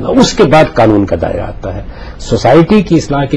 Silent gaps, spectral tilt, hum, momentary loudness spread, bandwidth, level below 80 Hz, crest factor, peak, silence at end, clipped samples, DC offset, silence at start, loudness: none; -6 dB/octave; none; 16 LU; 11 kHz; -26 dBFS; 10 dB; 0 dBFS; 0 s; 0.2%; under 0.1%; 0 s; -9 LUFS